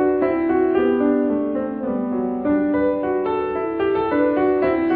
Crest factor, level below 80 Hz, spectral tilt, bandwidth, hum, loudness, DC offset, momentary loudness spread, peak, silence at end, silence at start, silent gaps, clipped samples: 14 dB; -48 dBFS; -10.5 dB/octave; 4.6 kHz; none; -20 LUFS; under 0.1%; 5 LU; -6 dBFS; 0 s; 0 s; none; under 0.1%